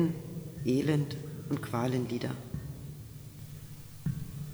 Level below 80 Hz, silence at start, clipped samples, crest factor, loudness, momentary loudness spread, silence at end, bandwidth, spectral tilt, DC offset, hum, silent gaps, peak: -56 dBFS; 0 s; under 0.1%; 18 dB; -34 LUFS; 16 LU; 0 s; over 20 kHz; -7 dB/octave; under 0.1%; none; none; -16 dBFS